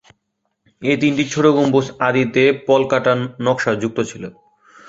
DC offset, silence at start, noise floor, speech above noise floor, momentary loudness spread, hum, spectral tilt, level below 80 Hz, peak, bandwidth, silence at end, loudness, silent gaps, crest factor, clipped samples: under 0.1%; 0.8 s; -72 dBFS; 56 dB; 10 LU; none; -5.5 dB/octave; -58 dBFS; 0 dBFS; 8 kHz; 0.6 s; -17 LUFS; none; 16 dB; under 0.1%